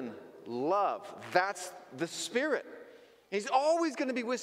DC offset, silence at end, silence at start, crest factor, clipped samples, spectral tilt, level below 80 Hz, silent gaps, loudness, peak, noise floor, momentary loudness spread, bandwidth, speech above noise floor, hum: under 0.1%; 0 s; 0 s; 22 dB; under 0.1%; -3.5 dB/octave; -86 dBFS; none; -32 LUFS; -12 dBFS; -56 dBFS; 15 LU; 16 kHz; 24 dB; none